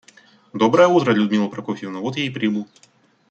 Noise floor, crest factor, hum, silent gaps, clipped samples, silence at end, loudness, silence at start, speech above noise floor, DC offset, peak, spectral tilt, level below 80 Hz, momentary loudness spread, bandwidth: -51 dBFS; 18 dB; none; none; under 0.1%; 0.65 s; -19 LUFS; 0.55 s; 33 dB; under 0.1%; -2 dBFS; -6 dB/octave; -66 dBFS; 14 LU; 8 kHz